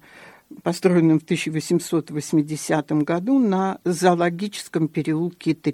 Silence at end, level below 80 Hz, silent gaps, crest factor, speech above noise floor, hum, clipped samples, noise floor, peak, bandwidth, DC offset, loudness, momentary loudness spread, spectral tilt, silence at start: 0 s; -66 dBFS; none; 18 dB; 26 dB; none; under 0.1%; -47 dBFS; -4 dBFS; 15 kHz; under 0.1%; -22 LUFS; 7 LU; -6 dB/octave; 0.15 s